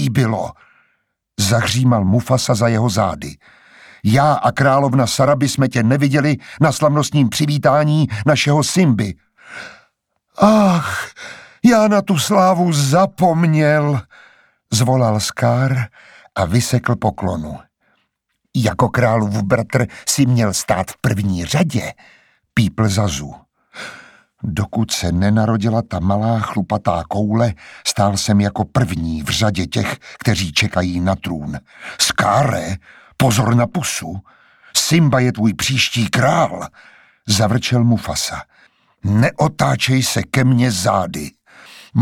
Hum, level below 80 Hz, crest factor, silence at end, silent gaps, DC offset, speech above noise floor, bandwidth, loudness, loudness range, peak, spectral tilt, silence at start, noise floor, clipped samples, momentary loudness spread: none; -46 dBFS; 16 dB; 0 s; none; under 0.1%; 55 dB; 17 kHz; -16 LUFS; 4 LU; 0 dBFS; -5 dB/octave; 0 s; -71 dBFS; under 0.1%; 13 LU